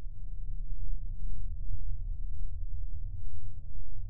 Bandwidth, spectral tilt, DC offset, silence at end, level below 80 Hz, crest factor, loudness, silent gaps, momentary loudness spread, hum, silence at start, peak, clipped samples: 0.8 kHz; -16.5 dB/octave; under 0.1%; 0 s; -36 dBFS; 8 dB; -44 LUFS; none; 5 LU; none; 0 s; -16 dBFS; under 0.1%